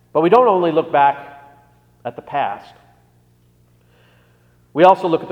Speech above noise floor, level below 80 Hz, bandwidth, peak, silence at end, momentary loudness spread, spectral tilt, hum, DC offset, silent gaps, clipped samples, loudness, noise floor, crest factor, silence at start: 40 dB; -62 dBFS; 8.6 kHz; 0 dBFS; 0 s; 19 LU; -7.5 dB/octave; 60 Hz at -55 dBFS; under 0.1%; none; under 0.1%; -15 LUFS; -55 dBFS; 18 dB; 0.15 s